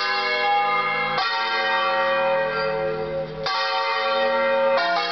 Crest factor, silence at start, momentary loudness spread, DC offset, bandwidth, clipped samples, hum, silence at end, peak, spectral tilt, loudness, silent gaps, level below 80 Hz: 10 dB; 0 s; 5 LU; 0.2%; 6.4 kHz; under 0.1%; none; 0 s; -12 dBFS; 0 dB/octave; -21 LUFS; none; -56 dBFS